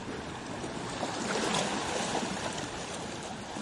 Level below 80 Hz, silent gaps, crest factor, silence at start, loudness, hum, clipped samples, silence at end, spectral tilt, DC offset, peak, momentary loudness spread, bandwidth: -58 dBFS; none; 18 dB; 0 s; -34 LUFS; none; under 0.1%; 0 s; -3 dB/octave; under 0.1%; -18 dBFS; 9 LU; 11.5 kHz